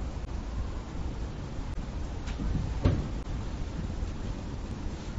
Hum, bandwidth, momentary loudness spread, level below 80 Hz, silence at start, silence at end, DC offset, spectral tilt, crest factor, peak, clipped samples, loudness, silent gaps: none; 8 kHz; 9 LU; -36 dBFS; 0 s; 0 s; under 0.1%; -7 dB/octave; 22 dB; -12 dBFS; under 0.1%; -36 LUFS; none